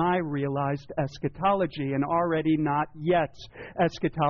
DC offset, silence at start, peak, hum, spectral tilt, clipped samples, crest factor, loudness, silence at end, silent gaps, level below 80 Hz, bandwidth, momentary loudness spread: under 0.1%; 0 s; -14 dBFS; none; -6 dB/octave; under 0.1%; 12 dB; -27 LUFS; 0 s; none; -54 dBFS; 6.8 kHz; 7 LU